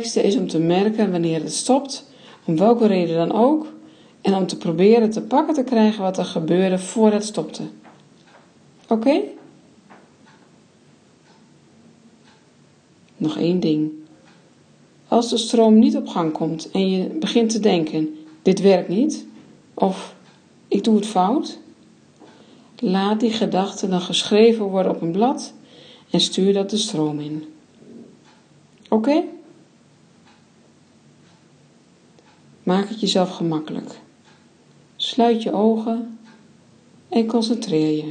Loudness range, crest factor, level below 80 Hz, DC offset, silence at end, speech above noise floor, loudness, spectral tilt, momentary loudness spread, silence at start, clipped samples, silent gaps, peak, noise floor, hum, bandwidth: 8 LU; 18 dB; -70 dBFS; under 0.1%; 0 s; 35 dB; -19 LUFS; -5.5 dB/octave; 13 LU; 0 s; under 0.1%; none; -2 dBFS; -53 dBFS; none; 9.8 kHz